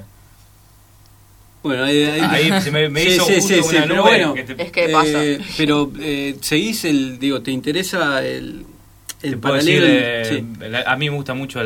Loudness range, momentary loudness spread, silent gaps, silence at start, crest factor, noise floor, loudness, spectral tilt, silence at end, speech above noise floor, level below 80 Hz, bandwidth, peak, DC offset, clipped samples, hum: 6 LU; 12 LU; none; 0 s; 18 dB; -48 dBFS; -16 LUFS; -4 dB/octave; 0 s; 31 dB; -48 dBFS; 18 kHz; 0 dBFS; under 0.1%; under 0.1%; none